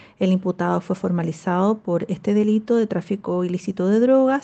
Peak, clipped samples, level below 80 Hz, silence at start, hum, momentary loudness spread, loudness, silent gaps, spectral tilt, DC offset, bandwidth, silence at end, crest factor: -6 dBFS; under 0.1%; -64 dBFS; 0.2 s; none; 7 LU; -21 LUFS; none; -8 dB/octave; under 0.1%; 8.4 kHz; 0 s; 14 dB